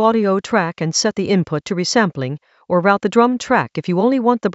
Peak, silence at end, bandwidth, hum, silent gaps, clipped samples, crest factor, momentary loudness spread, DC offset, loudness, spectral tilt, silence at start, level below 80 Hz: 0 dBFS; 0 s; 8.2 kHz; none; none; under 0.1%; 16 dB; 6 LU; under 0.1%; -17 LUFS; -5 dB/octave; 0 s; -58 dBFS